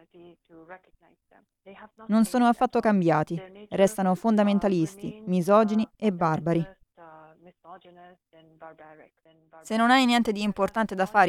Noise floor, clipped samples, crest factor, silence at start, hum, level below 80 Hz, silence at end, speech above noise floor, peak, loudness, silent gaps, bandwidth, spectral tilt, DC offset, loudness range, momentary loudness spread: -53 dBFS; under 0.1%; 20 dB; 0.7 s; none; -60 dBFS; 0 s; 28 dB; -6 dBFS; -24 LUFS; none; 14.5 kHz; -6 dB/octave; under 0.1%; 8 LU; 10 LU